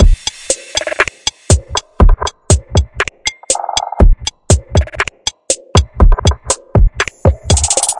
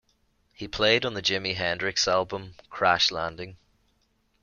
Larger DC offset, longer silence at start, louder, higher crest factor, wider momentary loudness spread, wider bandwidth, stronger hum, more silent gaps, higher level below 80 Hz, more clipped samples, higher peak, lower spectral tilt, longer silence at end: neither; second, 0 s vs 0.6 s; first, -14 LUFS vs -25 LUFS; second, 12 dB vs 22 dB; second, 7 LU vs 19 LU; first, 11.5 kHz vs 7.4 kHz; neither; neither; first, -16 dBFS vs -56 dBFS; first, 0.1% vs under 0.1%; first, 0 dBFS vs -6 dBFS; about the same, -3.5 dB/octave vs -2.5 dB/octave; second, 0 s vs 0.85 s